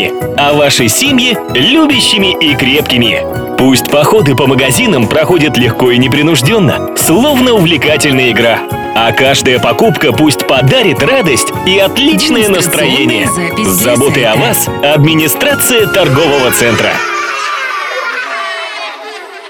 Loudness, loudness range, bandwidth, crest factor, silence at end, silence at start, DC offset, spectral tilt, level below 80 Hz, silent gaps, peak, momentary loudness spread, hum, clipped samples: -8 LUFS; 1 LU; over 20 kHz; 8 dB; 0 s; 0 s; under 0.1%; -4 dB/octave; -38 dBFS; none; 0 dBFS; 7 LU; none; under 0.1%